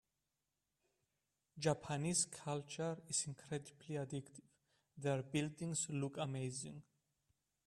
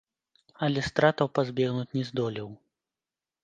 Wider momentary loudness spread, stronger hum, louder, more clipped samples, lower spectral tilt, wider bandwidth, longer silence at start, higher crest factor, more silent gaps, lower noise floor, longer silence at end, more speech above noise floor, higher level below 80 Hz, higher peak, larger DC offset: about the same, 10 LU vs 9 LU; neither; second, -42 LUFS vs -28 LUFS; neither; second, -4 dB/octave vs -6.5 dB/octave; first, 12.5 kHz vs 9.2 kHz; first, 1.55 s vs 0.6 s; about the same, 22 dB vs 24 dB; neither; about the same, -90 dBFS vs under -90 dBFS; about the same, 0.85 s vs 0.9 s; second, 47 dB vs over 63 dB; second, -78 dBFS vs -60 dBFS; second, -22 dBFS vs -6 dBFS; neither